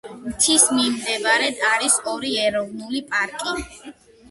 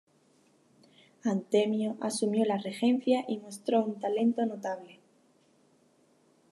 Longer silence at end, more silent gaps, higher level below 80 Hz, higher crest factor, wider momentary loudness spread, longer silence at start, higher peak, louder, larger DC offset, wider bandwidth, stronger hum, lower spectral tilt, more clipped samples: second, 0.4 s vs 1.6 s; neither; first, -52 dBFS vs -90 dBFS; about the same, 22 dB vs 18 dB; first, 14 LU vs 8 LU; second, 0.05 s vs 1.25 s; first, 0 dBFS vs -14 dBFS; first, -19 LUFS vs -30 LUFS; neither; about the same, 12 kHz vs 12 kHz; neither; second, -0.5 dB/octave vs -5.5 dB/octave; neither